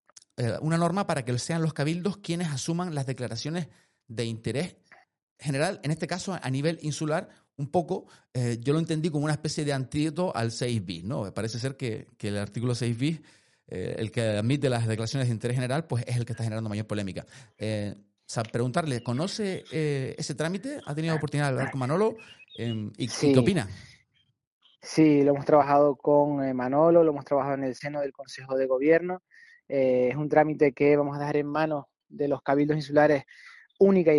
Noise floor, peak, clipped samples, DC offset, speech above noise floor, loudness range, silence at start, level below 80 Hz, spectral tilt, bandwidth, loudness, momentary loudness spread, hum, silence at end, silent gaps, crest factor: -69 dBFS; -6 dBFS; under 0.1%; under 0.1%; 43 dB; 8 LU; 0.4 s; -64 dBFS; -6.5 dB/octave; 11.5 kHz; -27 LUFS; 13 LU; none; 0 s; 5.22-5.36 s, 24.47-24.61 s; 20 dB